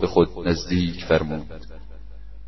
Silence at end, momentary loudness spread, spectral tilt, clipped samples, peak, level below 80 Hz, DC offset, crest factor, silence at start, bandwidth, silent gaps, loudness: 0 s; 23 LU; -6.5 dB/octave; under 0.1%; -4 dBFS; -40 dBFS; 1%; 20 dB; 0 s; 6.2 kHz; none; -23 LUFS